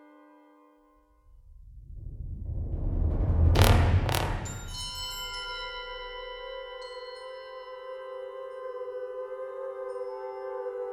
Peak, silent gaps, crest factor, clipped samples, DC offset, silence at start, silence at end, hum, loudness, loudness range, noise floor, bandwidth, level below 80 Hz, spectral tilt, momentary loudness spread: -4 dBFS; none; 28 dB; under 0.1%; under 0.1%; 0 s; 0 s; none; -31 LUFS; 12 LU; -62 dBFS; 17.5 kHz; -36 dBFS; -5.5 dB/octave; 17 LU